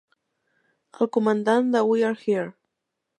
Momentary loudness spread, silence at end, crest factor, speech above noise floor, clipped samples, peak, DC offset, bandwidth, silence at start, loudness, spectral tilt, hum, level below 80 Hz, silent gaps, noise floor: 7 LU; 0.7 s; 18 dB; 60 dB; under 0.1%; -6 dBFS; under 0.1%; 10 kHz; 1 s; -23 LUFS; -6.5 dB/octave; none; -80 dBFS; none; -81 dBFS